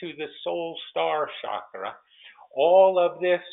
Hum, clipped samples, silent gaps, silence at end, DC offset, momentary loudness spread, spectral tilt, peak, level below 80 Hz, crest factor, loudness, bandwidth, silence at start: none; under 0.1%; none; 0.05 s; under 0.1%; 18 LU; -2 dB/octave; -6 dBFS; -76 dBFS; 18 dB; -24 LUFS; 4 kHz; 0 s